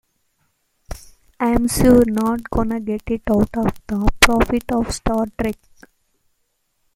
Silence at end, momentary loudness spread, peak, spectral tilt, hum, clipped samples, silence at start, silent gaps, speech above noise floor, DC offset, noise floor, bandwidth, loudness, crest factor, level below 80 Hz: 1.4 s; 14 LU; 0 dBFS; -4.5 dB/octave; none; under 0.1%; 0.9 s; none; 51 dB; under 0.1%; -68 dBFS; 16.5 kHz; -18 LUFS; 20 dB; -30 dBFS